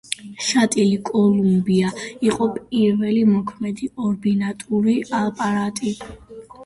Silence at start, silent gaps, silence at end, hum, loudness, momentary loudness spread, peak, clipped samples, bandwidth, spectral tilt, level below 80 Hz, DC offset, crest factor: 0.1 s; none; 0 s; none; -20 LUFS; 10 LU; -4 dBFS; under 0.1%; 11.5 kHz; -5.5 dB/octave; -54 dBFS; under 0.1%; 16 dB